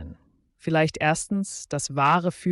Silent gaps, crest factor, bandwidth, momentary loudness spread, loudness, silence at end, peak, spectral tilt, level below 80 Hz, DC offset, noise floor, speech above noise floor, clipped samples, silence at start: none; 16 dB; 11.5 kHz; 10 LU; -24 LUFS; 0 s; -8 dBFS; -5 dB/octave; -54 dBFS; under 0.1%; -60 dBFS; 36 dB; under 0.1%; 0 s